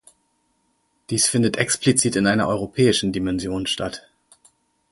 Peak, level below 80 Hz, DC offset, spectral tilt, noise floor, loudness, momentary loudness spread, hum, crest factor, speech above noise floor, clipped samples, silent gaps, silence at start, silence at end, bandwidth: -2 dBFS; -50 dBFS; under 0.1%; -4 dB/octave; -68 dBFS; -20 LUFS; 8 LU; none; 20 dB; 47 dB; under 0.1%; none; 1.1 s; 0.95 s; 12 kHz